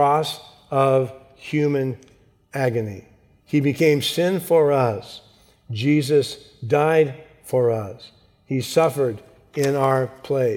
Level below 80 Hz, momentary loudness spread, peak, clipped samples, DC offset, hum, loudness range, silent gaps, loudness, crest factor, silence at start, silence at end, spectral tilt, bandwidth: -62 dBFS; 17 LU; -4 dBFS; under 0.1%; under 0.1%; none; 3 LU; none; -21 LUFS; 16 dB; 0 s; 0 s; -6 dB/octave; 18 kHz